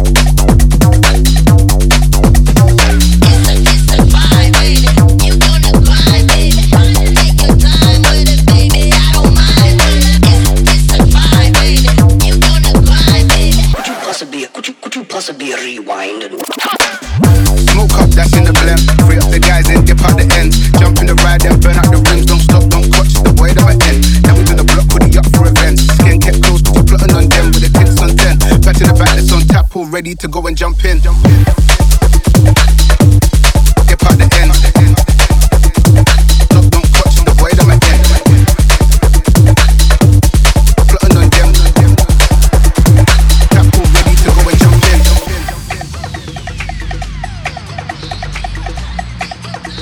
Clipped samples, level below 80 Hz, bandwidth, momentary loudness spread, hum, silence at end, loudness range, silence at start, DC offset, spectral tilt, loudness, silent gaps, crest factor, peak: 0.5%; -8 dBFS; 17.5 kHz; 13 LU; none; 0 s; 5 LU; 0 s; under 0.1%; -5 dB/octave; -8 LUFS; none; 6 dB; 0 dBFS